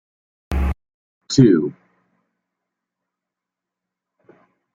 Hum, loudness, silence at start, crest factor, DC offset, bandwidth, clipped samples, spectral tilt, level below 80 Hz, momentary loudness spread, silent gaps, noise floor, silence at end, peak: none; -18 LUFS; 0.5 s; 22 dB; under 0.1%; 11 kHz; under 0.1%; -6.5 dB/octave; -34 dBFS; 15 LU; 0.94-1.21 s; -85 dBFS; 3 s; -2 dBFS